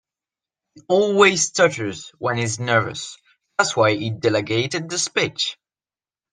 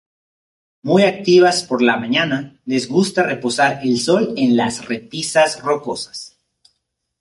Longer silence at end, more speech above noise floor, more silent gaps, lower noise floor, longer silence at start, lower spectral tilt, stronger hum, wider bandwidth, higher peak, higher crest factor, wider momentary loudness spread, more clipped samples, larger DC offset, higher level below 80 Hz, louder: about the same, 0.8 s vs 0.9 s; first, over 70 dB vs 56 dB; neither; first, under -90 dBFS vs -73 dBFS; about the same, 0.75 s vs 0.85 s; about the same, -3.5 dB/octave vs -4.5 dB/octave; neither; second, 10 kHz vs 11.5 kHz; about the same, -2 dBFS vs -2 dBFS; about the same, 20 dB vs 16 dB; about the same, 13 LU vs 13 LU; neither; neither; about the same, -64 dBFS vs -60 dBFS; second, -20 LUFS vs -17 LUFS